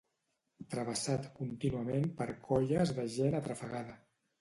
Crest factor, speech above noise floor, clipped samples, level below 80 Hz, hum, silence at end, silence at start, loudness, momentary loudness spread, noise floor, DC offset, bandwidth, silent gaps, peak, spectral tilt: 18 dB; 48 dB; under 0.1%; -62 dBFS; none; 0.45 s; 0.6 s; -36 LUFS; 11 LU; -83 dBFS; under 0.1%; 11.5 kHz; none; -18 dBFS; -6 dB/octave